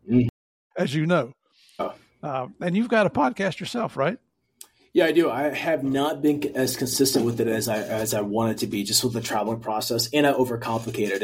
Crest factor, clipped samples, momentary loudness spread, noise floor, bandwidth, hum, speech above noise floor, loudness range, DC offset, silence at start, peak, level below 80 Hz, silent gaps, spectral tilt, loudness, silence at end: 18 dB; under 0.1%; 10 LU; -52 dBFS; 16.5 kHz; none; 29 dB; 3 LU; under 0.1%; 0.05 s; -6 dBFS; -58 dBFS; 0.29-0.70 s; -4.5 dB/octave; -24 LUFS; 0 s